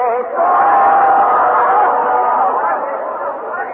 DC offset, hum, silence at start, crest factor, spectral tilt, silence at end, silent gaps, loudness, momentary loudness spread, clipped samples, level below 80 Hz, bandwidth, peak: under 0.1%; none; 0 s; 10 dB; -2.5 dB/octave; 0 s; none; -13 LUFS; 11 LU; under 0.1%; -62 dBFS; 3.6 kHz; -2 dBFS